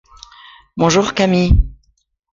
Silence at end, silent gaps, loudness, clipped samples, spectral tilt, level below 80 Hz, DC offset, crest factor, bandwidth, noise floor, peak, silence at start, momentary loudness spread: 0.6 s; none; -15 LUFS; under 0.1%; -5.5 dB/octave; -22 dBFS; under 0.1%; 16 dB; 7.6 kHz; -62 dBFS; -2 dBFS; 0.75 s; 12 LU